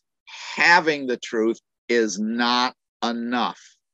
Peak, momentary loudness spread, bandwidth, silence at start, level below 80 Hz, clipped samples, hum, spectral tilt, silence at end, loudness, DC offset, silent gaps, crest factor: -2 dBFS; 13 LU; 8.4 kHz; 0.3 s; -74 dBFS; under 0.1%; none; -3 dB/octave; 0.4 s; -21 LUFS; under 0.1%; 1.78-1.88 s, 2.88-3.00 s; 20 dB